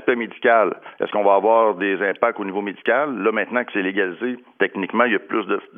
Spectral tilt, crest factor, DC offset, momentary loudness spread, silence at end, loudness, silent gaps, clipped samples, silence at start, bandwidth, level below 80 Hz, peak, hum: -8.5 dB/octave; 18 dB; under 0.1%; 8 LU; 0.15 s; -20 LUFS; none; under 0.1%; 0 s; 3.7 kHz; -86 dBFS; -2 dBFS; none